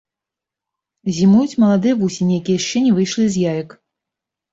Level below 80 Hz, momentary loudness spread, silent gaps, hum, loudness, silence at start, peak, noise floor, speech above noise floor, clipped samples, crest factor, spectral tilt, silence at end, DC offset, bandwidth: -56 dBFS; 11 LU; none; none; -16 LUFS; 1.05 s; -4 dBFS; -86 dBFS; 70 dB; under 0.1%; 14 dB; -6 dB/octave; 0.85 s; under 0.1%; 7.8 kHz